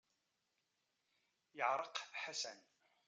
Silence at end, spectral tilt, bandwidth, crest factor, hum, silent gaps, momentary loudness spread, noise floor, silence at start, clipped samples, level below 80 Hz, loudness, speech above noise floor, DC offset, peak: 0.5 s; 0 dB/octave; 9.6 kHz; 24 dB; none; none; 16 LU; -86 dBFS; 1.55 s; under 0.1%; under -90 dBFS; -43 LUFS; 43 dB; under 0.1%; -24 dBFS